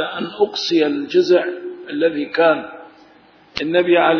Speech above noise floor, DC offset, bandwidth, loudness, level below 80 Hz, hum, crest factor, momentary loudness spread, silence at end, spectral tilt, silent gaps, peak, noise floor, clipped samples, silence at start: 32 dB; under 0.1%; 5.4 kHz; -18 LUFS; -60 dBFS; none; 16 dB; 13 LU; 0 s; -5 dB/octave; none; -2 dBFS; -49 dBFS; under 0.1%; 0 s